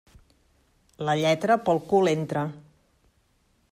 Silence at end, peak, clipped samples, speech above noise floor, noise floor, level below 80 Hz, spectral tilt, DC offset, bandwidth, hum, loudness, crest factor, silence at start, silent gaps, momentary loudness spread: 1.1 s; -10 dBFS; under 0.1%; 43 dB; -67 dBFS; -64 dBFS; -6 dB/octave; under 0.1%; 15.5 kHz; none; -24 LUFS; 18 dB; 1 s; none; 9 LU